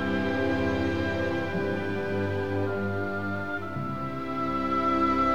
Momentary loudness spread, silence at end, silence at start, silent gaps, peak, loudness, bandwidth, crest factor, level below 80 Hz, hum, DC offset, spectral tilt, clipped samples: 8 LU; 0 s; 0 s; none; -14 dBFS; -28 LUFS; 14.5 kHz; 14 dB; -48 dBFS; none; 0.8%; -7.5 dB/octave; under 0.1%